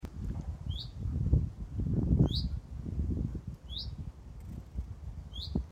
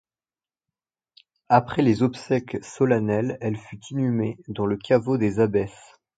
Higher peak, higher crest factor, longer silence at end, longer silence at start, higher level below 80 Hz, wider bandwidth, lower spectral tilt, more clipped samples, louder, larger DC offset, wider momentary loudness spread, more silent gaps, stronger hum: second, -14 dBFS vs -2 dBFS; about the same, 20 dB vs 22 dB; second, 0 s vs 0.45 s; second, 0 s vs 1.5 s; first, -38 dBFS vs -56 dBFS; about the same, 8.4 kHz vs 9.2 kHz; about the same, -8 dB/octave vs -7.5 dB/octave; neither; second, -36 LUFS vs -23 LUFS; neither; first, 15 LU vs 9 LU; neither; neither